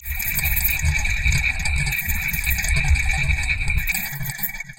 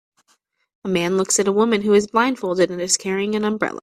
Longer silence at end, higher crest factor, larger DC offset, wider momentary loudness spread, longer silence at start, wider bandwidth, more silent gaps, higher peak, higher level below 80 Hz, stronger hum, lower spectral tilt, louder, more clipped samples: about the same, 0.05 s vs 0.05 s; about the same, 16 dB vs 18 dB; neither; about the same, 4 LU vs 6 LU; second, 0 s vs 0.85 s; first, 17.5 kHz vs 14.5 kHz; neither; second, -6 dBFS vs -2 dBFS; first, -24 dBFS vs -60 dBFS; neither; about the same, -2.5 dB/octave vs -3.5 dB/octave; about the same, -21 LUFS vs -19 LUFS; neither